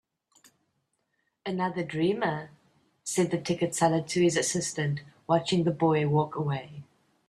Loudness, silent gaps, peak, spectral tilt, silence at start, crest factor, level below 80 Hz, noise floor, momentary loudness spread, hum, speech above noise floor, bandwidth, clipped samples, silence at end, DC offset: -28 LUFS; none; -10 dBFS; -5 dB/octave; 1.45 s; 20 dB; -66 dBFS; -77 dBFS; 12 LU; none; 50 dB; 13.5 kHz; under 0.1%; 0.45 s; under 0.1%